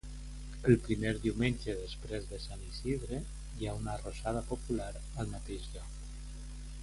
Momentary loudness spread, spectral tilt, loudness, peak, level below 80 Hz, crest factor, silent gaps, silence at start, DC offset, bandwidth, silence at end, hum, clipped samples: 17 LU; -6 dB/octave; -37 LUFS; -12 dBFS; -44 dBFS; 24 dB; none; 0.05 s; under 0.1%; 11.5 kHz; 0 s; none; under 0.1%